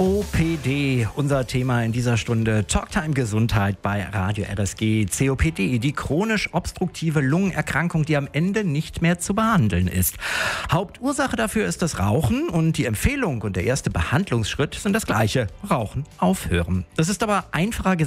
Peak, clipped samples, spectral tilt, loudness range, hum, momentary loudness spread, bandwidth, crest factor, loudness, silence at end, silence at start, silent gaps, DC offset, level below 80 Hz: -6 dBFS; under 0.1%; -5.5 dB/octave; 1 LU; none; 4 LU; 16 kHz; 16 dB; -22 LUFS; 0 s; 0 s; none; under 0.1%; -38 dBFS